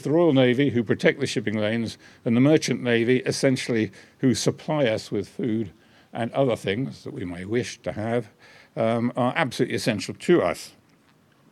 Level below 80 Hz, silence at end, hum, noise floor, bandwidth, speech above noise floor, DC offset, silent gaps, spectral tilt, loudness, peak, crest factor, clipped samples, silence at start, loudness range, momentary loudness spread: -64 dBFS; 0.85 s; none; -59 dBFS; 14 kHz; 36 dB; under 0.1%; none; -5.5 dB/octave; -24 LUFS; -4 dBFS; 20 dB; under 0.1%; 0 s; 6 LU; 13 LU